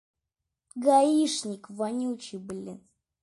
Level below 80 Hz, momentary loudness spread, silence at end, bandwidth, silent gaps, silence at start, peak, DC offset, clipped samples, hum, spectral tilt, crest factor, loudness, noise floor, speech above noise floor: -74 dBFS; 18 LU; 0.45 s; 11.5 kHz; none; 0.75 s; -10 dBFS; under 0.1%; under 0.1%; none; -4 dB/octave; 18 dB; -26 LUFS; -86 dBFS; 59 dB